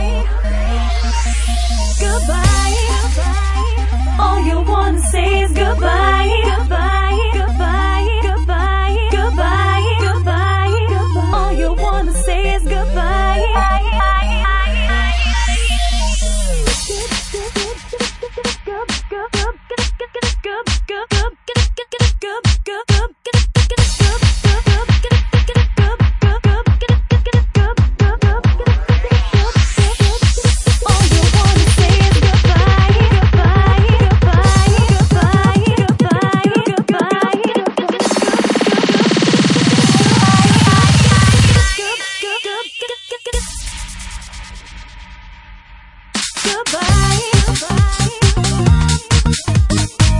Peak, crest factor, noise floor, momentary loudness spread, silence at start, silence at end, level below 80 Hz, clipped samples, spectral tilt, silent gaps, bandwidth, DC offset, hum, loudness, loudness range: 0 dBFS; 12 dB; -39 dBFS; 9 LU; 0 s; 0 s; -18 dBFS; under 0.1%; -5 dB/octave; none; 11.5 kHz; under 0.1%; none; -14 LUFS; 9 LU